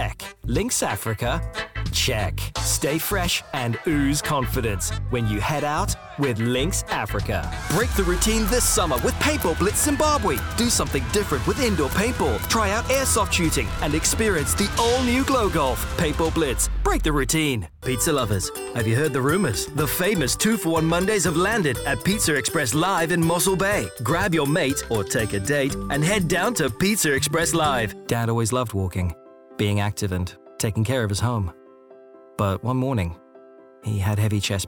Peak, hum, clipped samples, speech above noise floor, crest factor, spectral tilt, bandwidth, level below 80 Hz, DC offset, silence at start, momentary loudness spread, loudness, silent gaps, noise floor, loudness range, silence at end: -8 dBFS; none; under 0.1%; 26 dB; 14 dB; -4 dB/octave; 19.5 kHz; -34 dBFS; under 0.1%; 0 s; 6 LU; -22 LUFS; none; -48 dBFS; 5 LU; 0 s